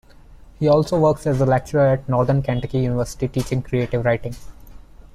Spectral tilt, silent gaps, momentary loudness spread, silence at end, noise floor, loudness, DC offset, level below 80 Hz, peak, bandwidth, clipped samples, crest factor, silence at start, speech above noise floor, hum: -7.5 dB/octave; none; 7 LU; 0.35 s; -44 dBFS; -20 LUFS; under 0.1%; -40 dBFS; -6 dBFS; 13.5 kHz; under 0.1%; 16 dB; 0.3 s; 25 dB; none